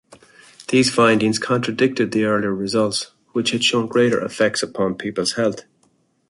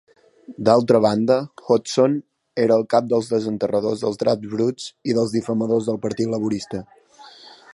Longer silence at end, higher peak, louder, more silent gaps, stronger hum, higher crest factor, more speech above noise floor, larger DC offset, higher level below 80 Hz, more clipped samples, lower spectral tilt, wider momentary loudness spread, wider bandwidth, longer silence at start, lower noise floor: first, 0.7 s vs 0.2 s; about the same, -2 dBFS vs -2 dBFS; about the same, -19 LUFS vs -20 LUFS; neither; neither; about the same, 18 dB vs 20 dB; first, 43 dB vs 26 dB; neither; about the same, -58 dBFS vs -60 dBFS; neither; second, -4 dB/octave vs -6 dB/octave; about the same, 8 LU vs 8 LU; about the same, 11.5 kHz vs 11.5 kHz; about the same, 0.6 s vs 0.5 s; first, -62 dBFS vs -46 dBFS